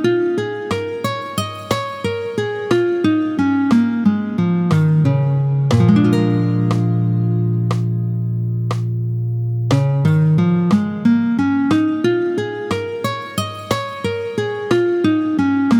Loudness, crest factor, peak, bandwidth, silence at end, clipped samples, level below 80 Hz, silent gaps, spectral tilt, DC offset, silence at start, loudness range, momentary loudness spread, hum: -18 LUFS; 14 dB; -2 dBFS; 17.5 kHz; 0 s; under 0.1%; -54 dBFS; none; -7.5 dB/octave; under 0.1%; 0 s; 4 LU; 8 LU; none